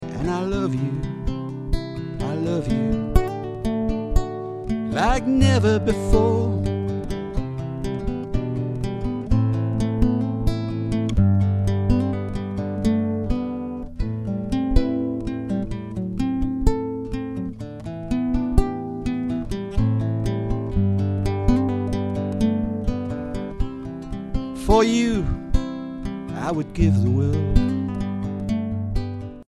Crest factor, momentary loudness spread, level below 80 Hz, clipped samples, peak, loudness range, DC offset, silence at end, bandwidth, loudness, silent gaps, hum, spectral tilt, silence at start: 20 dB; 10 LU; -28 dBFS; under 0.1%; -2 dBFS; 4 LU; under 0.1%; 0.05 s; 11.5 kHz; -24 LUFS; none; none; -7.5 dB/octave; 0 s